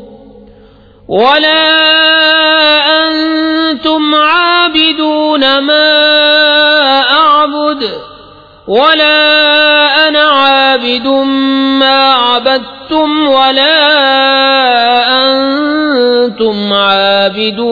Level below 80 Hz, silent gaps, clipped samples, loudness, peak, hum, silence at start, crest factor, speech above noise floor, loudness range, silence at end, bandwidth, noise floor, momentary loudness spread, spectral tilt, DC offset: -48 dBFS; none; 0.2%; -7 LUFS; 0 dBFS; none; 0 s; 8 dB; 31 dB; 2 LU; 0 s; 5.4 kHz; -39 dBFS; 6 LU; -5 dB/octave; under 0.1%